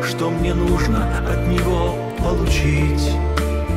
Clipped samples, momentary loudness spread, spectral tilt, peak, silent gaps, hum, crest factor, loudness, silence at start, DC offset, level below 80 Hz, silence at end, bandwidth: under 0.1%; 3 LU; -6 dB/octave; -4 dBFS; none; none; 14 dB; -19 LUFS; 0 s; under 0.1%; -22 dBFS; 0 s; 15.5 kHz